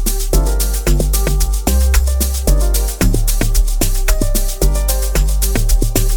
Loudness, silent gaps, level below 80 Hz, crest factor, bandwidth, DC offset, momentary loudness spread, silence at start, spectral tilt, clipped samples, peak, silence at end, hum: -16 LUFS; none; -14 dBFS; 12 dB; 19.5 kHz; under 0.1%; 2 LU; 0 s; -4.5 dB/octave; under 0.1%; 0 dBFS; 0 s; none